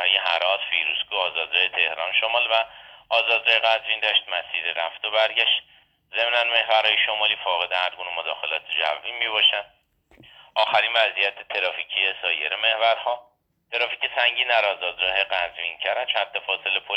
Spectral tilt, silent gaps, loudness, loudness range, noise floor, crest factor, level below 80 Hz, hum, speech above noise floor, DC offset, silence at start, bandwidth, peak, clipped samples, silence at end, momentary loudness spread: -1 dB/octave; none; -21 LUFS; 2 LU; -55 dBFS; 18 dB; -68 dBFS; none; 32 dB; under 0.1%; 0 s; 8.4 kHz; -4 dBFS; under 0.1%; 0 s; 8 LU